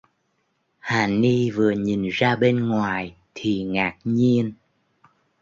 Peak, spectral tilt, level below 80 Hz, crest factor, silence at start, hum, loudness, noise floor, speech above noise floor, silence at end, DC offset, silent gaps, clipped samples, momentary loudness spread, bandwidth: -6 dBFS; -7 dB/octave; -56 dBFS; 18 dB; 0.85 s; none; -22 LUFS; -70 dBFS; 49 dB; 0.9 s; under 0.1%; none; under 0.1%; 10 LU; 7.6 kHz